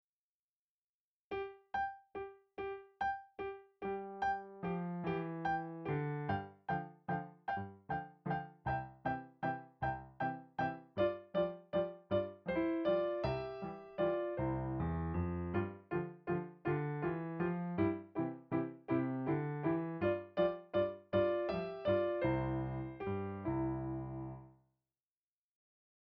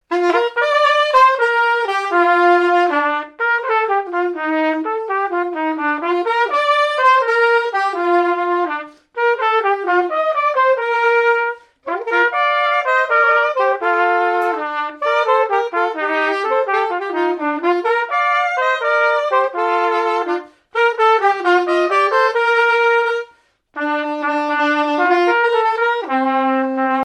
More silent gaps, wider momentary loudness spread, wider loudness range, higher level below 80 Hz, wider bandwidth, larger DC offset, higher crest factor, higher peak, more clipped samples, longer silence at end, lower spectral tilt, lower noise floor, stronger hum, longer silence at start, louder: neither; about the same, 9 LU vs 7 LU; first, 6 LU vs 2 LU; first, -60 dBFS vs -72 dBFS; second, 6 kHz vs 10.5 kHz; neither; about the same, 18 dB vs 14 dB; second, -22 dBFS vs -2 dBFS; neither; first, 1.55 s vs 0 s; first, -9.5 dB/octave vs -2 dB/octave; first, under -90 dBFS vs -52 dBFS; neither; first, 1.3 s vs 0.1 s; second, -39 LUFS vs -16 LUFS